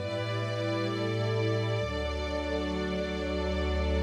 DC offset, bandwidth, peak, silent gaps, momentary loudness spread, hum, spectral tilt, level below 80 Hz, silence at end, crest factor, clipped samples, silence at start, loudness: under 0.1%; 10.5 kHz; -18 dBFS; none; 3 LU; none; -6.5 dB/octave; -38 dBFS; 0 s; 12 dB; under 0.1%; 0 s; -31 LUFS